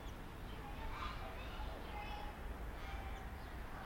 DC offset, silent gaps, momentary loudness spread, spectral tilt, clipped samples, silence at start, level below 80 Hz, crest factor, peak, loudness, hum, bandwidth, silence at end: under 0.1%; none; 4 LU; -5.5 dB/octave; under 0.1%; 0 s; -50 dBFS; 14 dB; -32 dBFS; -49 LUFS; none; 16.5 kHz; 0 s